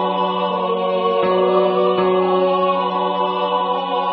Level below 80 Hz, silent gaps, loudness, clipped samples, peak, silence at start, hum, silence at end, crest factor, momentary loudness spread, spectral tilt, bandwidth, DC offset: -64 dBFS; none; -18 LUFS; under 0.1%; -2 dBFS; 0 s; none; 0 s; 14 dB; 4 LU; -11 dB/octave; 5.6 kHz; under 0.1%